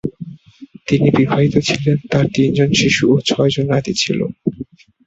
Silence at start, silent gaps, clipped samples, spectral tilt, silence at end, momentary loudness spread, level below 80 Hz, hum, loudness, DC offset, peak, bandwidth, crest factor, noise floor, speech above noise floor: 0.05 s; none; under 0.1%; -5.5 dB/octave; 0.45 s; 17 LU; -46 dBFS; none; -15 LUFS; under 0.1%; -2 dBFS; 8 kHz; 14 dB; -40 dBFS; 26 dB